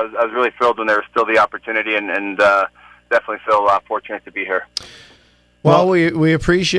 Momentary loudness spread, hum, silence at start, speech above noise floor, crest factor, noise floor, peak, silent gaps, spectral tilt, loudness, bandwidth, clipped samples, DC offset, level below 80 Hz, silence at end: 11 LU; 60 Hz at -60 dBFS; 0 s; 37 dB; 18 dB; -53 dBFS; 0 dBFS; none; -5.5 dB/octave; -17 LUFS; 11 kHz; under 0.1%; under 0.1%; -44 dBFS; 0 s